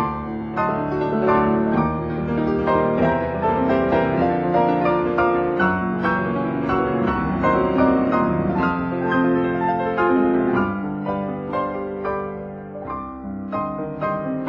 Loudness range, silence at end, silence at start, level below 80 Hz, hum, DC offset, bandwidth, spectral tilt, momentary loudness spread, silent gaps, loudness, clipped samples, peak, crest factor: 5 LU; 0 s; 0 s; -42 dBFS; none; under 0.1%; 5.8 kHz; -9.5 dB/octave; 9 LU; none; -21 LUFS; under 0.1%; -6 dBFS; 14 dB